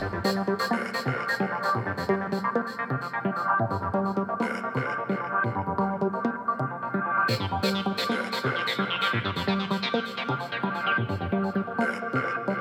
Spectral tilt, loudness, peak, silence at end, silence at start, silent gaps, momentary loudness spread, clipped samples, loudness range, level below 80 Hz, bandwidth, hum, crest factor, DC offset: -6 dB/octave; -27 LUFS; -12 dBFS; 0 s; 0 s; none; 4 LU; under 0.1%; 1 LU; -58 dBFS; 17 kHz; none; 16 dB; under 0.1%